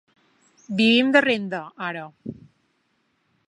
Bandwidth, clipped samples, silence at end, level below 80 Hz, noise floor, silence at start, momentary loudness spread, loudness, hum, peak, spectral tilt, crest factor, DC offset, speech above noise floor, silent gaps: 10.5 kHz; under 0.1%; 1.15 s; -68 dBFS; -69 dBFS; 0.7 s; 21 LU; -21 LUFS; none; -4 dBFS; -5 dB/octave; 20 dB; under 0.1%; 48 dB; none